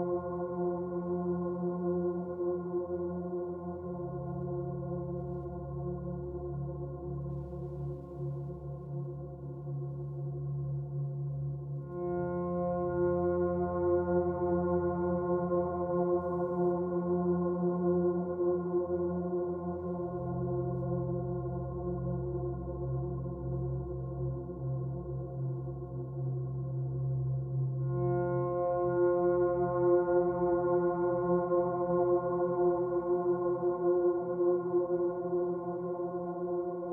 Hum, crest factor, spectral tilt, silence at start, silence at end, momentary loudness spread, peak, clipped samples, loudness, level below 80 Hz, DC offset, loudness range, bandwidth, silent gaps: none; 16 dB; -14 dB/octave; 0 s; 0 s; 10 LU; -18 dBFS; under 0.1%; -33 LUFS; -52 dBFS; under 0.1%; 9 LU; 2.3 kHz; none